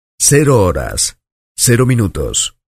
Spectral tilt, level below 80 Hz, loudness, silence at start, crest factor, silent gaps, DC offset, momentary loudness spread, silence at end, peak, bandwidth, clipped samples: -4 dB/octave; -32 dBFS; -13 LUFS; 0.2 s; 14 dB; 1.32-1.55 s; under 0.1%; 7 LU; 0.25 s; 0 dBFS; 15.5 kHz; under 0.1%